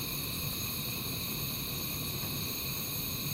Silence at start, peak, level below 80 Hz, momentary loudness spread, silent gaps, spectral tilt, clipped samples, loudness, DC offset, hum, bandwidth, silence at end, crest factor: 0 s; -22 dBFS; -52 dBFS; 1 LU; none; -3 dB/octave; under 0.1%; -34 LUFS; under 0.1%; none; 16 kHz; 0 s; 14 dB